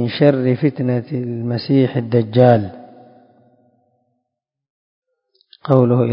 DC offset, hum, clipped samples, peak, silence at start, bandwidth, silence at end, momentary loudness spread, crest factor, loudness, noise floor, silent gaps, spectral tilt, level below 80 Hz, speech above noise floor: under 0.1%; none; under 0.1%; 0 dBFS; 0 s; 5.4 kHz; 0 s; 10 LU; 18 dB; -16 LUFS; -79 dBFS; 4.70-5.02 s; -10.5 dB/octave; -56 dBFS; 64 dB